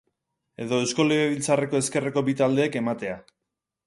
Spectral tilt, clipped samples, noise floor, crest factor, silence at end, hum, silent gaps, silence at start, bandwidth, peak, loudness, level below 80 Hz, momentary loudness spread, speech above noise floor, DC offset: -4.5 dB/octave; under 0.1%; -84 dBFS; 18 dB; 0.65 s; none; none; 0.6 s; 11.5 kHz; -6 dBFS; -24 LUFS; -66 dBFS; 10 LU; 60 dB; under 0.1%